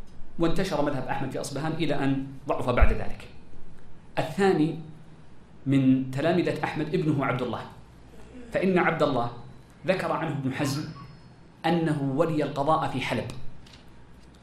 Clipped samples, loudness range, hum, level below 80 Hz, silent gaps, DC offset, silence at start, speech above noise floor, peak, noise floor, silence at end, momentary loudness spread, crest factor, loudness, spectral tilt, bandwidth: under 0.1%; 2 LU; none; -36 dBFS; none; under 0.1%; 0 s; 25 dB; -6 dBFS; -50 dBFS; 0.15 s; 17 LU; 20 dB; -27 LUFS; -6.5 dB/octave; 13.5 kHz